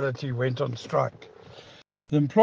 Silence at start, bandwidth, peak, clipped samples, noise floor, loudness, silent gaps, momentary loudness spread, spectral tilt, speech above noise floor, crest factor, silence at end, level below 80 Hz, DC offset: 0 s; 7.4 kHz; -6 dBFS; under 0.1%; -53 dBFS; -28 LUFS; none; 21 LU; -7.5 dB/octave; 28 dB; 22 dB; 0 s; -64 dBFS; under 0.1%